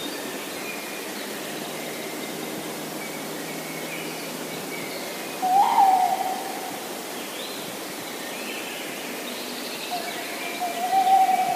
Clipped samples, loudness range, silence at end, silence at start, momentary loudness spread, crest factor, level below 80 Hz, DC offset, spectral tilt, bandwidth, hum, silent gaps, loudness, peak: under 0.1%; 7 LU; 0 s; 0 s; 13 LU; 18 dB; -78 dBFS; under 0.1%; -2 dB/octave; 15.5 kHz; none; none; -27 LUFS; -8 dBFS